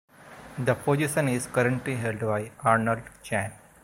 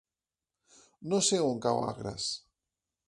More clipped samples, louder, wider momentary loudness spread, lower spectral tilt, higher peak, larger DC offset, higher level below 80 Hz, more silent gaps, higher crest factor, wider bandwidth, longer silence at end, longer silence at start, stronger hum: neither; first, -27 LUFS vs -31 LUFS; second, 8 LU vs 11 LU; first, -6 dB/octave vs -3.5 dB/octave; first, -6 dBFS vs -14 dBFS; neither; first, -58 dBFS vs -66 dBFS; neither; about the same, 20 dB vs 20 dB; first, 16.5 kHz vs 11.5 kHz; second, 0.25 s vs 0.7 s; second, 0.2 s vs 1 s; neither